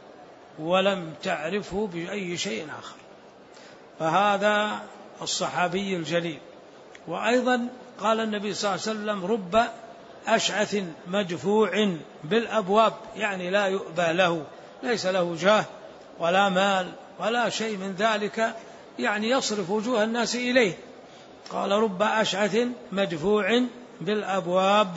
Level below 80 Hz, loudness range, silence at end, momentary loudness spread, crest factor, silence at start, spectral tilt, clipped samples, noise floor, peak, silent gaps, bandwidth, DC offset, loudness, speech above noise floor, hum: -64 dBFS; 3 LU; 0 s; 14 LU; 20 dB; 0 s; -4 dB/octave; under 0.1%; -49 dBFS; -6 dBFS; none; 8 kHz; under 0.1%; -25 LUFS; 24 dB; none